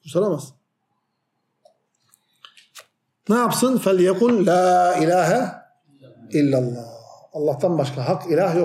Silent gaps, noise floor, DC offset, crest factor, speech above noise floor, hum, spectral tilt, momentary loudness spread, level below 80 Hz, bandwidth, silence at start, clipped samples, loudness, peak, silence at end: none; -74 dBFS; under 0.1%; 16 dB; 55 dB; none; -6 dB/octave; 13 LU; -72 dBFS; 15.5 kHz; 0.05 s; under 0.1%; -19 LUFS; -6 dBFS; 0 s